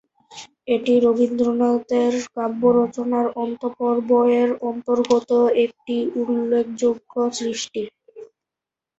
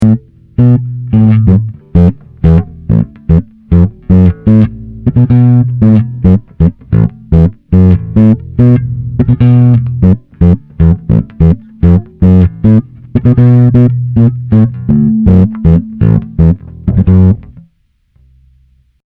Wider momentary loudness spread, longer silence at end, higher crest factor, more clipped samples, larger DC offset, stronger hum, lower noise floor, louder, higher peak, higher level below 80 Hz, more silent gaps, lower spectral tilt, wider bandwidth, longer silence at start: first, 9 LU vs 6 LU; second, 0.75 s vs 1.6 s; first, 16 dB vs 8 dB; second, under 0.1% vs 5%; second, under 0.1% vs 0.2%; neither; first, -87 dBFS vs -53 dBFS; second, -20 LUFS vs -9 LUFS; second, -4 dBFS vs 0 dBFS; second, -64 dBFS vs -22 dBFS; neither; second, -5 dB/octave vs -12 dB/octave; first, 8 kHz vs 3.7 kHz; first, 0.3 s vs 0 s